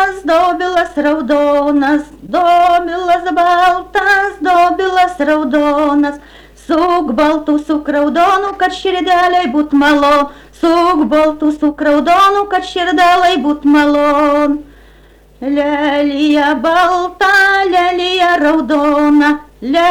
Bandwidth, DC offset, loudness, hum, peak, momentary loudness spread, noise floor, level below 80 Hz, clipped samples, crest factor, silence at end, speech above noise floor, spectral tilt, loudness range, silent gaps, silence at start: 14 kHz; under 0.1%; -12 LUFS; none; -4 dBFS; 6 LU; -43 dBFS; -42 dBFS; under 0.1%; 8 dB; 0 s; 31 dB; -4 dB/octave; 2 LU; none; 0 s